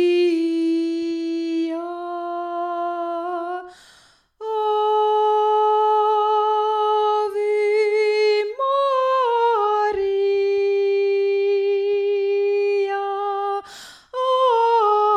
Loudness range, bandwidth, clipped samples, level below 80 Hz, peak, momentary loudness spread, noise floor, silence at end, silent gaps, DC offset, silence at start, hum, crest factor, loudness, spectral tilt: 7 LU; 9.4 kHz; under 0.1%; -66 dBFS; -8 dBFS; 9 LU; -54 dBFS; 0 s; none; under 0.1%; 0 s; none; 12 dB; -20 LUFS; -3.5 dB/octave